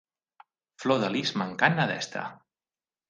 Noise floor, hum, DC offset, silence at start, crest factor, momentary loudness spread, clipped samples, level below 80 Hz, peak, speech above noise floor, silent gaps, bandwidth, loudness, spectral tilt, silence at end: under -90 dBFS; none; under 0.1%; 0.8 s; 26 dB; 11 LU; under 0.1%; -72 dBFS; -4 dBFS; over 63 dB; none; 9.8 kHz; -27 LUFS; -5 dB/octave; 0.75 s